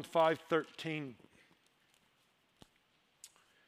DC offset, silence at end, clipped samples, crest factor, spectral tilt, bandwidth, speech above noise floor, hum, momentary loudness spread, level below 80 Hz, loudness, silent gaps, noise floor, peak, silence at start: under 0.1%; 0.4 s; under 0.1%; 22 dB; -5 dB/octave; 15.5 kHz; 39 dB; none; 27 LU; -84 dBFS; -35 LUFS; none; -74 dBFS; -18 dBFS; 0 s